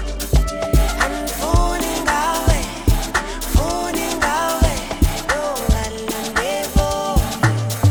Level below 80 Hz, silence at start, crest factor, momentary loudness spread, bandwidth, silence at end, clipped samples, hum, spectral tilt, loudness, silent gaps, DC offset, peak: -22 dBFS; 0 s; 16 dB; 3 LU; over 20 kHz; 0 s; under 0.1%; none; -4.5 dB/octave; -19 LUFS; none; under 0.1%; -2 dBFS